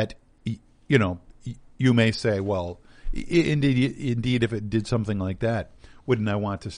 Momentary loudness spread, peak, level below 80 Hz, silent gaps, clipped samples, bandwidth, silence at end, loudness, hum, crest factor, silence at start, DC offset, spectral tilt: 17 LU; -4 dBFS; -42 dBFS; none; under 0.1%; 10 kHz; 0 s; -25 LUFS; none; 20 dB; 0 s; under 0.1%; -7 dB/octave